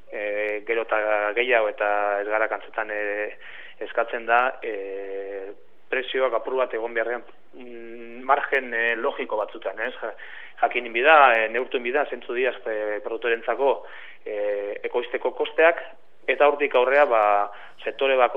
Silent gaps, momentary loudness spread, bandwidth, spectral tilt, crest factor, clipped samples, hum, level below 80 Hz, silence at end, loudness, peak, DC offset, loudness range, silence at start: none; 16 LU; 5 kHz; -4.5 dB/octave; 22 dB; under 0.1%; none; -78 dBFS; 0 s; -23 LUFS; -2 dBFS; 0.9%; 6 LU; 0.1 s